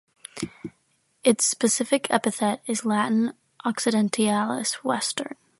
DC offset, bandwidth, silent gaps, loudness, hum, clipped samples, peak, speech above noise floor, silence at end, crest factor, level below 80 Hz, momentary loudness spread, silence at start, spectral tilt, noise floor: under 0.1%; 12 kHz; none; -24 LUFS; none; under 0.1%; -4 dBFS; 44 dB; 0.25 s; 20 dB; -68 dBFS; 14 LU; 0.35 s; -3.5 dB/octave; -68 dBFS